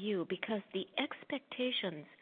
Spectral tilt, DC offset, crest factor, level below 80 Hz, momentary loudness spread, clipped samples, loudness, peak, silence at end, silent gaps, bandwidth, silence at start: -2.5 dB/octave; under 0.1%; 20 dB; -88 dBFS; 7 LU; under 0.1%; -38 LUFS; -18 dBFS; 0.05 s; none; 4.6 kHz; 0 s